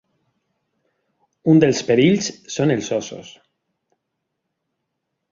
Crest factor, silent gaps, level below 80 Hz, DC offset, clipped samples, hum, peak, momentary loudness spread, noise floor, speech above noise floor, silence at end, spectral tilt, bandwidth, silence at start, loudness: 20 dB; none; -60 dBFS; under 0.1%; under 0.1%; none; -2 dBFS; 11 LU; -77 dBFS; 60 dB; 2 s; -5.5 dB/octave; 7.6 kHz; 1.45 s; -18 LUFS